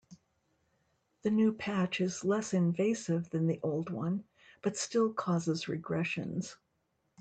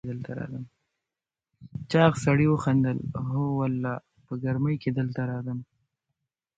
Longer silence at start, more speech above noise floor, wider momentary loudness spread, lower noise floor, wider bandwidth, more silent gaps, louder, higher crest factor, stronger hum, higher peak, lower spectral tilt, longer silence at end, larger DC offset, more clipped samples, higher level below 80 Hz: about the same, 0.1 s vs 0.05 s; second, 47 dB vs 64 dB; second, 8 LU vs 16 LU; second, -78 dBFS vs -90 dBFS; about the same, 9 kHz vs 9 kHz; neither; second, -33 LUFS vs -27 LUFS; second, 14 dB vs 20 dB; neither; second, -18 dBFS vs -8 dBFS; second, -6 dB/octave vs -7.5 dB/octave; second, 0.65 s vs 0.95 s; neither; neither; second, -72 dBFS vs -56 dBFS